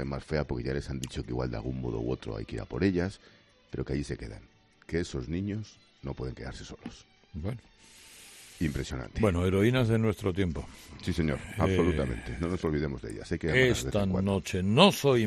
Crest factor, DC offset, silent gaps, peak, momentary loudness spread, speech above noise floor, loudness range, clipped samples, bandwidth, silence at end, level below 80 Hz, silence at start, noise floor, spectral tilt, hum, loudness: 24 dB; under 0.1%; none; -6 dBFS; 19 LU; 22 dB; 10 LU; under 0.1%; 13.5 kHz; 0 s; -46 dBFS; 0 s; -52 dBFS; -6 dB/octave; none; -30 LUFS